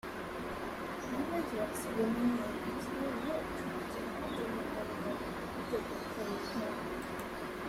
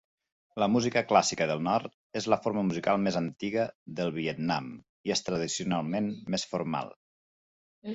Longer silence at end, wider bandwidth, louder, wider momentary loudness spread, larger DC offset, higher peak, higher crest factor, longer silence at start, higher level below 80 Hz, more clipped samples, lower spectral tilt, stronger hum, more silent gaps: about the same, 0 s vs 0 s; first, 16 kHz vs 8.4 kHz; second, -38 LUFS vs -30 LUFS; second, 6 LU vs 10 LU; neither; second, -20 dBFS vs -6 dBFS; second, 16 dB vs 24 dB; second, 0.05 s vs 0.55 s; first, -58 dBFS vs -66 dBFS; neither; about the same, -5 dB/octave vs -4.5 dB/octave; neither; second, none vs 1.94-2.10 s, 3.75-3.86 s, 4.89-5.04 s, 6.96-7.82 s